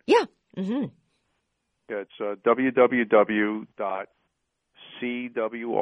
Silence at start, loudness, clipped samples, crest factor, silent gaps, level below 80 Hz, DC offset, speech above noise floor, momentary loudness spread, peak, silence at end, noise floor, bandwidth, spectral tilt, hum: 0.1 s; -25 LUFS; under 0.1%; 20 dB; none; -70 dBFS; under 0.1%; 53 dB; 15 LU; -6 dBFS; 0 s; -77 dBFS; 10 kHz; -6 dB/octave; none